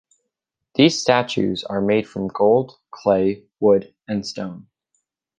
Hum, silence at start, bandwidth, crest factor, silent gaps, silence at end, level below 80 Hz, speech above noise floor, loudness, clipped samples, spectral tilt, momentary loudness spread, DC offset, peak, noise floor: none; 0.8 s; 9.4 kHz; 18 dB; none; 0.8 s; -56 dBFS; 62 dB; -20 LUFS; under 0.1%; -5 dB/octave; 11 LU; under 0.1%; -2 dBFS; -81 dBFS